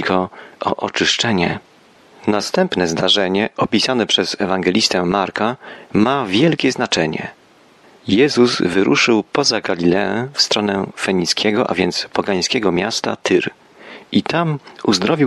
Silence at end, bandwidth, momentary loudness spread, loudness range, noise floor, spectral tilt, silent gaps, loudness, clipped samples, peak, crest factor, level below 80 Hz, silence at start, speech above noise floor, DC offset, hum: 0 s; 12.5 kHz; 7 LU; 3 LU; -49 dBFS; -4 dB/octave; none; -17 LUFS; under 0.1%; -2 dBFS; 16 dB; -54 dBFS; 0 s; 32 dB; under 0.1%; none